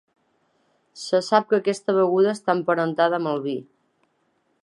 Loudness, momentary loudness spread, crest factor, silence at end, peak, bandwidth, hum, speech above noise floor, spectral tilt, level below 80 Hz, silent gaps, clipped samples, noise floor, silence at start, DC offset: -22 LUFS; 8 LU; 20 dB; 1 s; -2 dBFS; 11.5 kHz; none; 47 dB; -5.5 dB/octave; -78 dBFS; none; under 0.1%; -69 dBFS; 0.95 s; under 0.1%